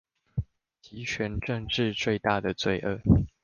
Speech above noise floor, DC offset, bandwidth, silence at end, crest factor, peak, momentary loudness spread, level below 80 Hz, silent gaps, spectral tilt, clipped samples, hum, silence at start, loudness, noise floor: 30 dB; under 0.1%; 7.2 kHz; 0.15 s; 20 dB; -8 dBFS; 13 LU; -42 dBFS; none; -6 dB/octave; under 0.1%; none; 0.35 s; -28 LUFS; -57 dBFS